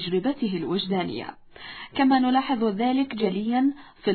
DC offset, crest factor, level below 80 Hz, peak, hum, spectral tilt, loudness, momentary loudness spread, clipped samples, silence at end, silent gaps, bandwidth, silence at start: under 0.1%; 16 dB; -60 dBFS; -10 dBFS; none; -9.5 dB/octave; -24 LUFS; 15 LU; under 0.1%; 0 s; none; 4.6 kHz; 0 s